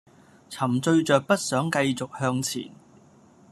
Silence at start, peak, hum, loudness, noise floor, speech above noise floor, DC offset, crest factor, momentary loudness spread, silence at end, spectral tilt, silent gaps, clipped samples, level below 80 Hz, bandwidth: 0.5 s; -6 dBFS; none; -24 LUFS; -55 dBFS; 30 dB; under 0.1%; 20 dB; 12 LU; 0.8 s; -5 dB/octave; none; under 0.1%; -66 dBFS; 13.5 kHz